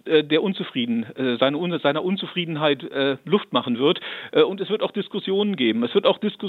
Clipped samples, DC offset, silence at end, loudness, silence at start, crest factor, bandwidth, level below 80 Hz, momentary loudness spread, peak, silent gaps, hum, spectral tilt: under 0.1%; under 0.1%; 0 s; -22 LUFS; 0.05 s; 20 dB; 4.5 kHz; -76 dBFS; 5 LU; -2 dBFS; none; none; -8 dB/octave